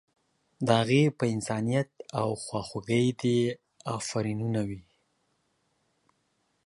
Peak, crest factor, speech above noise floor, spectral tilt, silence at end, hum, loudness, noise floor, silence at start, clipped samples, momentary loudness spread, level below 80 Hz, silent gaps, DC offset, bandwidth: -6 dBFS; 24 dB; 47 dB; -6 dB/octave; 1.85 s; none; -29 LUFS; -74 dBFS; 0.6 s; under 0.1%; 11 LU; -62 dBFS; none; under 0.1%; 11.5 kHz